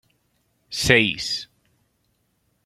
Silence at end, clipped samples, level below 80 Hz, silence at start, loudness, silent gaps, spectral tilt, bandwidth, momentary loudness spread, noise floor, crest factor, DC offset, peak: 1.2 s; under 0.1%; -50 dBFS; 0.7 s; -20 LUFS; none; -3.5 dB/octave; 15.5 kHz; 16 LU; -69 dBFS; 26 dB; under 0.1%; 0 dBFS